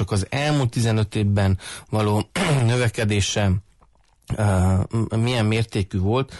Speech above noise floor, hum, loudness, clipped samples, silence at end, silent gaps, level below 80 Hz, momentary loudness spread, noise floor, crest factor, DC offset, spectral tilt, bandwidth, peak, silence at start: 37 dB; none; -22 LUFS; under 0.1%; 0 s; none; -44 dBFS; 4 LU; -57 dBFS; 12 dB; under 0.1%; -6 dB/octave; 11.5 kHz; -10 dBFS; 0 s